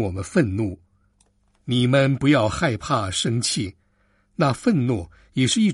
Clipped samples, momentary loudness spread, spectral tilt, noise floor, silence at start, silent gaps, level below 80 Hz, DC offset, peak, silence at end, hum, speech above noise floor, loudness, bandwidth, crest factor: under 0.1%; 12 LU; -5 dB/octave; -63 dBFS; 0 s; none; -48 dBFS; under 0.1%; -6 dBFS; 0 s; none; 43 dB; -22 LUFS; 11.5 kHz; 16 dB